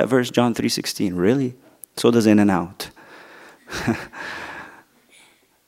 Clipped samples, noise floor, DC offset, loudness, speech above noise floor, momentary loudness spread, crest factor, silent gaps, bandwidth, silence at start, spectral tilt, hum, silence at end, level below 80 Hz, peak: under 0.1%; -55 dBFS; under 0.1%; -20 LUFS; 36 dB; 19 LU; 20 dB; none; 16 kHz; 0 s; -5.5 dB/octave; none; 0.95 s; -56 dBFS; -2 dBFS